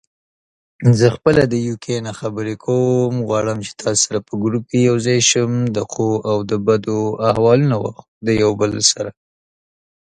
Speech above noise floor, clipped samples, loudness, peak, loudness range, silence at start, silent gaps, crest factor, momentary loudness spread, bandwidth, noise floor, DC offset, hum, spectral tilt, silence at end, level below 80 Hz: over 73 dB; under 0.1%; -17 LUFS; 0 dBFS; 2 LU; 0.8 s; 8.08-8.21 s; 18 dB; 10 LU; 11 kHz; under -90 dBFS; under 0.1%; none; -4.5 dB/octave; 0.95 s; -48 dBFS